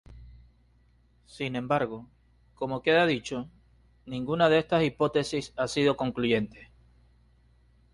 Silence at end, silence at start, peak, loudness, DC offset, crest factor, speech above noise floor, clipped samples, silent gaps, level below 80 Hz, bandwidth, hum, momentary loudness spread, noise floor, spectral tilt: 1.3 s; 0.1 s; -8 dBFS; -27 LUFS; under 0.1%; 20 dB; 36 dB; under 0.1%; none; -58 dBFS; 11.5 kHz; none; 14 LU; -63 dBFS; -5.5 dB/octave